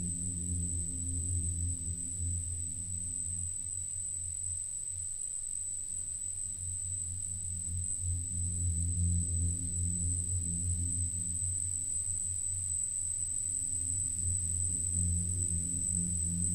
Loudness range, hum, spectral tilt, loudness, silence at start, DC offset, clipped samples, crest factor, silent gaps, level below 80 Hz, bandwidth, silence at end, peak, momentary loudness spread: 4 LU; none; -4 dB/octave; -33 LUFS; 0 s; under 0.1%; under 0.1%; 14 dB; none; -46 dBFS; 15.5 kHz; 0 s; -20 dBFS; 5 LU